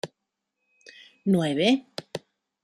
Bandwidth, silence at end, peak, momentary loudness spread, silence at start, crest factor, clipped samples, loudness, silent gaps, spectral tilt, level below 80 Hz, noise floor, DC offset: 13 kHz; 0.45 s; -8 dBFS; 18 LU; 0.05 s; 22 dB; under 0.1%; -24 LUFS; none; -6 dB/octave; -70 dBFS; -83 dBFS; under 0.1%